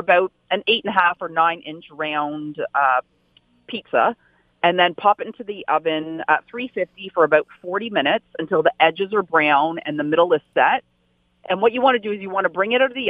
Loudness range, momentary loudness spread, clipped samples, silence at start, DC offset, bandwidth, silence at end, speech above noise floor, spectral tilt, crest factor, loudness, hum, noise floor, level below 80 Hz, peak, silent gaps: 3 LU; 10 LU; under 0.1%; 0 s; under 0.1%; 5 kHz; 0 s; 44 dB; -7 dB/octave; 20 dB; -20 LUFS; none; -64 dBFS; -68 dBFS; 0 dBFS; none